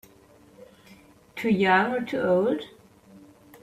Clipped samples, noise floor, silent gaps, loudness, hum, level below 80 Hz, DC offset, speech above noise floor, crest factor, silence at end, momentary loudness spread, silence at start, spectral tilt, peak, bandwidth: under 0.1%; -55 dBFS; none; -24 LUFS; none; -66 dBFS; under 0.1%; 32 dB; 18 dB; 0.45 s; 16 LU; 0.6 s; -6.5 dB/octave; -8 dBFS; 15 kHz